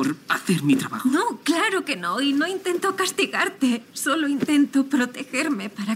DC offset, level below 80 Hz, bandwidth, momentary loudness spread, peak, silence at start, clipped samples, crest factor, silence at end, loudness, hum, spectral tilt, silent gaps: under 0.1%; -72 dBFS; 16 kHz; 5 LU; -6 dBFS; 0 s; under 0.1%; 16 dB; 0 s; -22 LUFS; none; -4 dB/octave; none